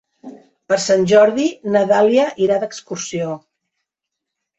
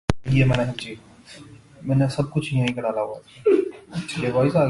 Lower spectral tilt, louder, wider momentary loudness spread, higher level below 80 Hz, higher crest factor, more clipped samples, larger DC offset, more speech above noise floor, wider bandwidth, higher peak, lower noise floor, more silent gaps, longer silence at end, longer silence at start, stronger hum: second, -4.5 dB/octave vs -7 dB/octave; first, -16 LUFS vs -23 LUFS; about the same, 14 LU vs 16 LU; second, -60 dBFS vs -46 dBFS; second, 16 dB vs 22 dB; neither; neither; first, 66 dB vs 23 dB; second, 8.2 kHz vs 11.5 kHz; about the same, -2 dBFS vs 0 dBFS; first, -81 dBFS vs -45 dBFS; neither; first, 1.2 s vs 0 s; first, 0.25 s vs 0.1 s; neither